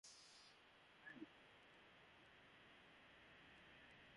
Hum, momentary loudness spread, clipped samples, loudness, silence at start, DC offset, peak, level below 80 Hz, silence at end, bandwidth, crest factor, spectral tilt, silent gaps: none; 6 LU; under 0.1%; -65 LUFS; 0.05 s; under 0.1%; -44 dBFS; -86 dBFS; 0 s; 11 kHz; 22 dB; -2.5 dB/octave; none